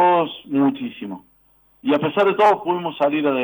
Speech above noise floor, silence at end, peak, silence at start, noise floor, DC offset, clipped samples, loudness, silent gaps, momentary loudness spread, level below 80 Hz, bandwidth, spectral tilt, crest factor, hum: 38 dB; 0 s; -6 dBFS; 0 s; -58 dBFS; under 0.1%; under 0.1%; -19 LUFS; none; 15 LU; -66 dBFS; over 20 kHz; -7 dB/octave; 14 dB; none